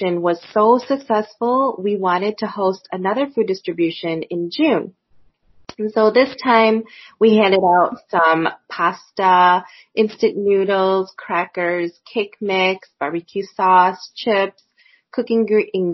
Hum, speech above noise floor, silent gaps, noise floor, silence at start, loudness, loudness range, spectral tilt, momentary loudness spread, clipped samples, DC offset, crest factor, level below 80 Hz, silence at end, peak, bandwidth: none; 36 dB; none; -54 dBFS; 0 s; -18 LUFS; 5 LU; -3.5 dB/octave; 11 LU; under 0.1%; under 0.1%; 18 dB; -66 dBFS; 0 s; 0 dBFS; 6.2 kHz